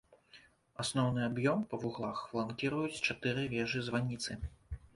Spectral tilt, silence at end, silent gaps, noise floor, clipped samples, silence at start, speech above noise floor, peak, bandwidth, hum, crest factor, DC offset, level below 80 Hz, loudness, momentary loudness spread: -5 dB/octave; 0.2 s; none; -62 dBFS; under 0.1%; 0.1 s; 27 dB; -18 dBFS; 11.5 kHz; none; 20 dB; under 0.1%; -56 dBFS; -36 LUFS; 8 LU